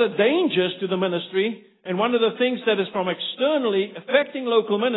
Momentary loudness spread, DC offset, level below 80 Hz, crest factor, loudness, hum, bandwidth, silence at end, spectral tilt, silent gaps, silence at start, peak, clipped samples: 5 LU; under 0.1%; -72 dBFS; 20 dB; -22 LUFS; none; 4.1 kHz; 0 s; -10 dB/octave; none; 0 s; -2 dBFS; under 0.1%